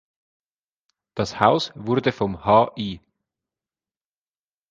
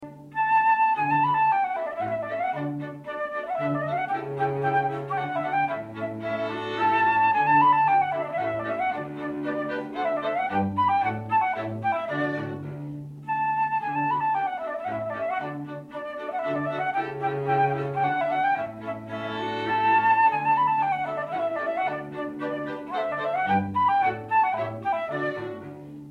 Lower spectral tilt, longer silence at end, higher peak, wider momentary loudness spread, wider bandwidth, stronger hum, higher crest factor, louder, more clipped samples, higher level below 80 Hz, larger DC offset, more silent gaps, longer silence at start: second, -6 dB/octave vs -7.5 dB/octave; first, 1.75 s vs 0 s; first, 0 dBFS vs -10 dBFS; about the same, 13 LU vs 12 LU; first, 9.2 kHz vs 7 kHz; neither; first, 24 dB vs 16 dB; first, -21 LUFS vs -25 LUFS; neither; first, -54 dBFS vs -66 dBFS; neither; neither; first, 1.15 s vs 0 s